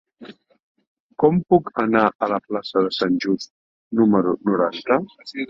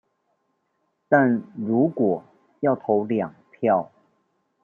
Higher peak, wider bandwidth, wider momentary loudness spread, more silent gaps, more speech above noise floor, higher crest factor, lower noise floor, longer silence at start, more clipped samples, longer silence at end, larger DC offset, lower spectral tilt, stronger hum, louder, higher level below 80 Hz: about the same, -2 dBFS vs -4 dBFS; first, 7.6 kHz vs 3.3 kHz; about the same, 9 LU vs 8 LU; first, 0.63-0.75 s, 0.87-1.09 s, 2.15-2.19 s, 3.50-3.91 s vs none; second, 24 dB vs 51 dB; about the same, 18 dB vs 20 dB; second, -44 dBFS vs -73 dBFS; second, 0.2 s vs 1.1 s; neither; second, 0.05 s vs 0.8 s; neither; second, -7 dB/octave vs -10.5 dB/octave; neither; first, -20 LUFS vs -23 LUFS; first, -58 dBFS vs -72 dBFS